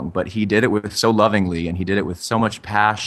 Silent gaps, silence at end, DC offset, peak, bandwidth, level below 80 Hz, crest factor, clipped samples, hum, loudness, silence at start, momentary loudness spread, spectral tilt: none; 0 s; under 0.1%; -2 dBFS; 13 kHz; -46 dBFS; 18 dB; under 0.1%; none; -19 LUFS; 0 s; 6 LU; -5 dB/octave